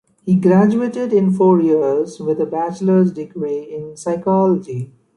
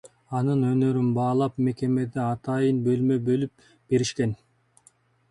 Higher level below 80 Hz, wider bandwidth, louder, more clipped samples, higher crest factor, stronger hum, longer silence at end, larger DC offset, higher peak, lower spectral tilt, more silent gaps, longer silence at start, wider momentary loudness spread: about the same, -60 dBFS vs -60 dBFS; about the same, 10.5 kHz vs 11 kHz; first, -16 LUFS vs -25 LUFS; neither; about the same, 14 dB vs 14 dB; neither; second, 0.3 s vs 0.95 s; neither; first, -2 dBFS vs -10 dBFS; first, -9 dB/octave vs -7.5 dB/octave; neither; first, 0.25 s vs 0.05 s; first, 13 LU vs 6 LU